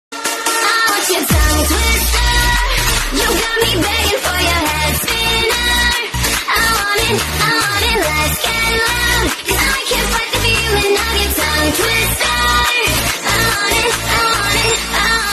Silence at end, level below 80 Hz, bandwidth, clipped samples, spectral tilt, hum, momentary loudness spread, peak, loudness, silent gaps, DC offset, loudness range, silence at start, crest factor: 0 s; -24 dBFS; 13.5 kHz; under 0.1%; -2.5 dB/octave; none; 2 LU; 0 dBFS; -13 LUFS; none; under 0.1%; 1 LU; 0.1 s; 14 dB